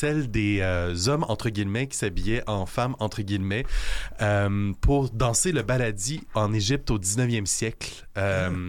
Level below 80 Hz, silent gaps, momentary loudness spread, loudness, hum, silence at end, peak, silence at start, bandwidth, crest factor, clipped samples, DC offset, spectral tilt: -34 dBFS; none; 6 LU; -26 LUFS; none; 0 s; -12 dBFS; 0 s; 17 kHz; 14 dB; under 0.1%; under 0.1%; -4.5 dB/octave